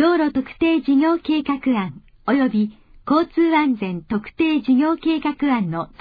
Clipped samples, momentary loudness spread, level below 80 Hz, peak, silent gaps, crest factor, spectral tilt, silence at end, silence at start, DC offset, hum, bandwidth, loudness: under 0.1%; 9 LU; -52 dBFS; -6 dBFS; none; 12 dB; -9 dB/octave; 0.15 s; 0 s; under 0.1%; none; 5 kHz; -20 LUFS